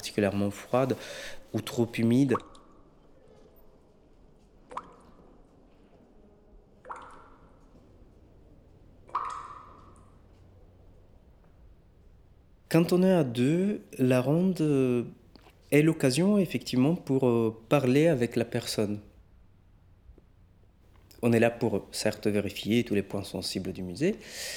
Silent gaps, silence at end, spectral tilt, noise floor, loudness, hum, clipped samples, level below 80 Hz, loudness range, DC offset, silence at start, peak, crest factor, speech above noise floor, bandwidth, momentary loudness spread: none; 0 s; -6.5 dB/octave; -58 dBFS; -27 LUFS; none; under 0.1%; -60 dBFS; 17 LU; under 0.1%; 0 s; -8 dBFS; 20 dB; 32 dB; 18.5 kHz; 16 LU